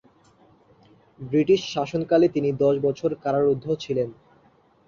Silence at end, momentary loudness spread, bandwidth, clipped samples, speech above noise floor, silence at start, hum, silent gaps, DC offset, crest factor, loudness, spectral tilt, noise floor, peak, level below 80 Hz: 0.75 s; 7 LU; 7.4 kHz; under 0.1%; 37 dB; 1.2 s; none; none; under 0.1%; 16 dB; -23 LUFS; -7 dB/octave; -59 dBFS; -8 dBFS; -62 dBFS